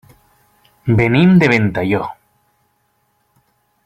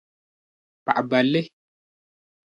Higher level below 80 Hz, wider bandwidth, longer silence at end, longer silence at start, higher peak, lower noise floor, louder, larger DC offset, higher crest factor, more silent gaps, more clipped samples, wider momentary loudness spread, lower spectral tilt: first, -46 dBFS vs -74 dBFS; second, 8.2 kHz vs 9.6 kHz; first, 1.7 s vs 1.05 s; about the same, 0.85 s vs 0.85 s; first, 0 dBFS vs -4 dBFS; second, -63 dBFS vs under -90 dBFS; first, -14 LUFS vs -22 LUFS; neither; second, 16 dB vs 24 dB; neither; neither; about the same, 13 LU vs 14 LU; about the same, -8 dB/octave vs -7 dB/octave